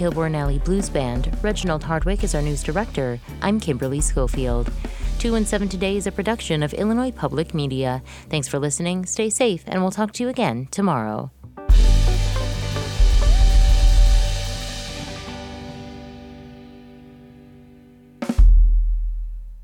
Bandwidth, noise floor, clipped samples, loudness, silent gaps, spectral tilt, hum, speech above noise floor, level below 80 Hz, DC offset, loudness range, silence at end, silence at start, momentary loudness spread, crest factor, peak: 12.5 kHz; -47 dBFS; under 0.1%; -22 LUFS; none; -5 dB/octave; none; 25 dB; -22 dBFS; under 0.1%; 6 LU; 0 s; 0 s; 15 LU; 14 dB; -6 dBFS